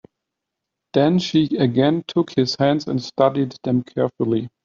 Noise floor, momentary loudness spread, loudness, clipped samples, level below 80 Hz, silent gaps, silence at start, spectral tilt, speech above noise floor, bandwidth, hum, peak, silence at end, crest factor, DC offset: -82 dBFS; 6 LU; -20 LUFS; under 0.1%; -60 dBFS; none; 0.95 s; -6 dB/octave; 63 dB; 7.6 kHz; none; -2 dBFS; 0.15 s; 18 dB; under 0.1%